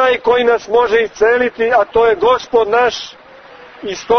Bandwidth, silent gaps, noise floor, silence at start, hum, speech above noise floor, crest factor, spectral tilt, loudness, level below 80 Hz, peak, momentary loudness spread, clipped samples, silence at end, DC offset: 6.6 kHz; none; -38 dBFS; 0 s; none; 25 dB; 12 dB; -3.5 dB/octave; -13 LUFS; -46 dBFS; -2 dBFS; 13 LU; under 0.1%; 0 s; under 0.1%